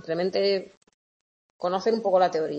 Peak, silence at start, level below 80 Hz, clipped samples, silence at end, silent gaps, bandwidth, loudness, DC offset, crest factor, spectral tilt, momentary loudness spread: -10 dBFS; 0.05 s; -74 dBFS; under 0.1%; 0 s; 0.77-0.81 s, 0.94-1.59 s; 8.2 kHz; -25 LUFS; under 0.1%; 16 dB; -5.5 dB/octave; 8 LU